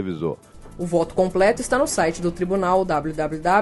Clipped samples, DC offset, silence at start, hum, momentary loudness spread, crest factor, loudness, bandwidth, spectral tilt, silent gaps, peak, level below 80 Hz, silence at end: under 0.1%; under 0.1%; 0 s; none; 9 LU; 16 dB; -21 LUFS; 11.5 kHz; -5 dB/octave; none; -4 dBFS; -42 dBFS; 0 s